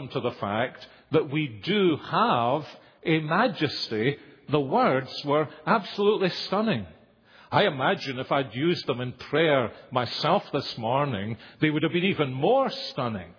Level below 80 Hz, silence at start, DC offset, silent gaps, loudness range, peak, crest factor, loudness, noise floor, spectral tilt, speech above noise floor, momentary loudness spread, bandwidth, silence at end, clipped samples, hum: -66 dBFS; 0 s; under 0.1%; none; 1 LU; -6 dBFS; 20 dB; -26 LUFS; -55 dBFS; -7 dB/octave; 29 dB; 8 LU; 5.4 kHz; 0.05 s; under 0.1%; none